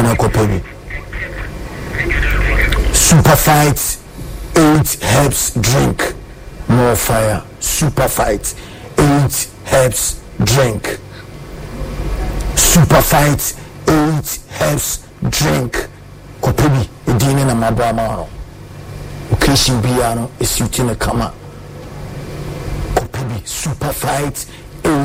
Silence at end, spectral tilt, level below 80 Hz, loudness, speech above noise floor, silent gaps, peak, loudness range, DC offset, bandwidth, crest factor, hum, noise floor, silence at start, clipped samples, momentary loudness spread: 0 s; -4.5 dB/octave; -24 dBFS; -14 LUFS; 21 dB; none; 0 dBFS; 7 LU; under 0.1%; 16.5 kHz; 14 dB; none; -34 dBFS; 0 s; under 0.1%; 19 LU